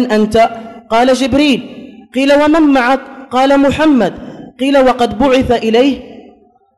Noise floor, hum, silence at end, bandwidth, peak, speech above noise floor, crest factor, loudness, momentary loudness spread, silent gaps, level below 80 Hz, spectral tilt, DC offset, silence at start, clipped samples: -45 dBFS; none; 0.6 s; 12 kHz; -2 dBFS; 35 dB; 10 dB; -11 LUFS; 10 LU; none; -38 dBFS; -5 dB/octave; under 0.1%; 0 s; under 0.1%